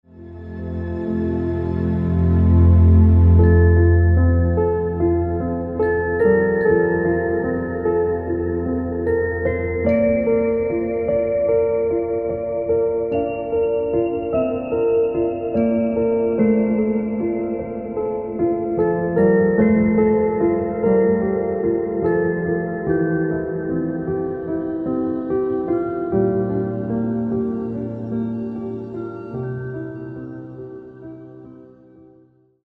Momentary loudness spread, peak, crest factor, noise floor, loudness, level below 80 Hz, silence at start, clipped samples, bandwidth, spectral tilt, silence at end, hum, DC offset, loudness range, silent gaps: 12 LU; -4 dBFS; 16 dB; -54 dBFS; -19 LUFS; -32 dBFS; 0.15 s; under 0.1%; 3 kHz; -12.5 dB/octave; 1.15 s; none; under 0.1%; 10 LU; none